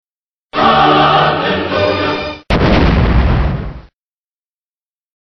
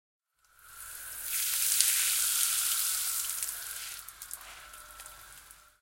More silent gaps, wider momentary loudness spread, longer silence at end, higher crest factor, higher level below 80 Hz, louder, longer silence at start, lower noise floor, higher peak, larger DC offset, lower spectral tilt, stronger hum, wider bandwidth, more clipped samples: neither; second, 11 LU vs 23 LU; first, 1.4 s vs 0.25 s; second, 14 dB vs 32 dB; first, -20 dBFS vs -66 dBFS; first, -12 LUFS vs -28 LUFS; about the same, 0.55 s vs 0.65 s; first, under -90 dBFS vs -62 dBFS; about the same, 0 dBFS vs -2 dBFS; neither; first, -7.5 dB/octave vs 4 dB/octave; neither; second, 6.4 kHz vs 17 kHz; neither